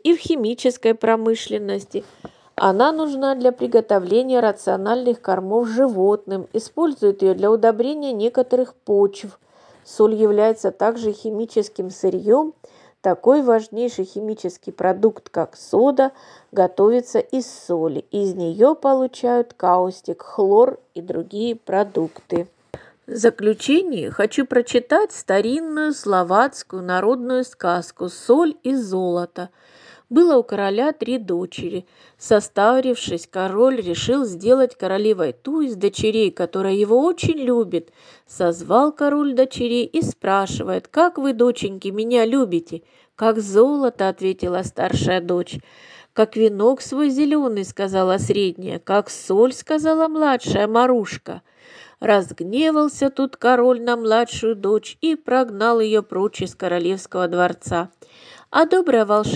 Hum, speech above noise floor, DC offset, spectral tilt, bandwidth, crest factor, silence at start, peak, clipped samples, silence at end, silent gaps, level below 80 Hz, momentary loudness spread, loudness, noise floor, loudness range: none; 25 dB; under 0.1%; -5.5 dB/octave; 10.5 kHz; 18 dB; 0.05 s; 0 dBFS; under 0.1%; 0 s; none; -58 dBFS; 10 LU; -19 LUFS; -44 dBFS; 2 LU